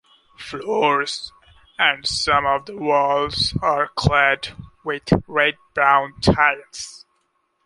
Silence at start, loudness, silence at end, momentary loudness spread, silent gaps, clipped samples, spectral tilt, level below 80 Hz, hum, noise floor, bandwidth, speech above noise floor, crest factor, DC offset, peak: 0.4 s; -19 LUFS; 0.7 s; 16 LU; none; under 0.1%; -4.5 dB/octave; -42 dBFS; none; -68 dBFS; 11.5 kHz; 48 dB; 20 dB; under 0.1%; -2 dBFS